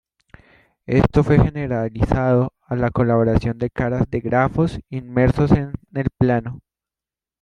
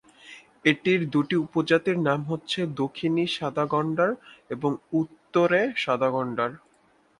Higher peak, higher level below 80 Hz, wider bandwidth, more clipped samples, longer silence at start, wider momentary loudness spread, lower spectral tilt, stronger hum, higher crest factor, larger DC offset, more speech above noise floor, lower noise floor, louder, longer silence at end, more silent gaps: about the same, -2 dBFS vs -4 dBFS; first, -34 dBFS vs -68 dBFS; second, 8.4 kHz vs 11 kHz; neither; first, 0.9 s vs 0.25 s; about the same, 8 LU vs 7 LU; first, -9.5 dB/octave vs -6.5 dB/octave; neither; about the same, 18 dB vs 20 dB; neither; first, 71 dB vs 38 dB; first, -90 dBFS vs -62 dBFS; first, -19 LUFS vs -25 LUFS; first, 0.85 s vs 0.6 s; neither